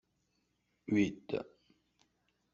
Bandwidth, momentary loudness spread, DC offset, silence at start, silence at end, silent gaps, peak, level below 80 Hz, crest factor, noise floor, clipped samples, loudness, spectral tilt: 7.4 kHz; 20 LU; under 0.1%; 0.9 s; 1.1 s; none; -18 dBFS; -72 dBFS; 20 dB; -79 dBFS; under 0.1%; -36 LUFS; -6.5 dB/octave